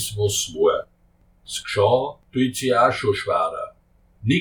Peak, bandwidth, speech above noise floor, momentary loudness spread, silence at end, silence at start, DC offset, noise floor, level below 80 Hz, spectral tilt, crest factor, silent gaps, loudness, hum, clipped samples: -4 dBFS; 19 kHz; 37 dB; 12 LU; 0 s; 0 s; under 0.1%; -58 dBFS; -52 dBFS; -4.5 dB/octave; 18 dB; none; -22 LUFS; none; under 0.1%